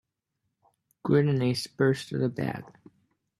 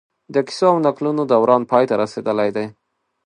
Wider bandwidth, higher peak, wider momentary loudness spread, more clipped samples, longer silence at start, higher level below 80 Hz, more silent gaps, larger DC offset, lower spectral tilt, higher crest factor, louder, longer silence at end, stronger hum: first, 12.5 kHz vs 10.5 kHz; second, -12 dBFS vs 0 dBFS; first, 11 LU vs 8 LU; neither; first, 1.05 s vs 0.3 s; about the same, -66 dBFS vs -66 dBFS; neither; neither; about the same, -7 dB/octave vs -6.5 dB/octave; about the same, 18 dB vs 18 dB; second, -27 LUFS vs -18 LUFS; first, 0.7 s vs 0.55 s; neither